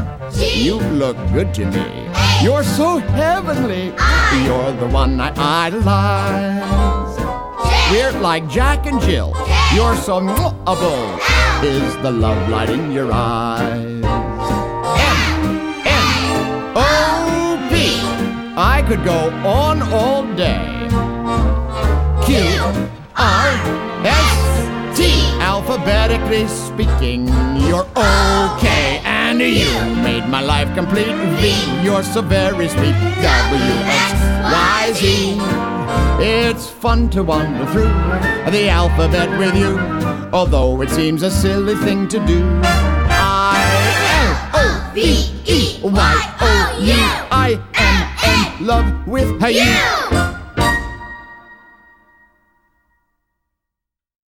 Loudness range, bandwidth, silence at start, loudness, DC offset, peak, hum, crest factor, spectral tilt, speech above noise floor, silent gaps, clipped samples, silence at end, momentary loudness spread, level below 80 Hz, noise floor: 3 LU; 17.5 kHz; 0 s; -15 LUFS; under 0.1%; -2 dBFS; none; 14 dB; -5 dB/octave; 68 dB; none; under 0.1%; 2.8 s; 6 LU; -22 dBFS; -83 dBFS